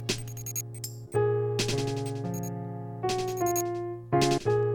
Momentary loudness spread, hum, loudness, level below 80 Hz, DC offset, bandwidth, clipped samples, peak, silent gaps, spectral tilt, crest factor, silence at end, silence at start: 10 LU; none; -30 LUFS; -54 dBFS; under 0.1%; 19 kHz; under 0.1%; -12 dBFS; none; -5 dB/octave; 16 dB; 0 s; 0 s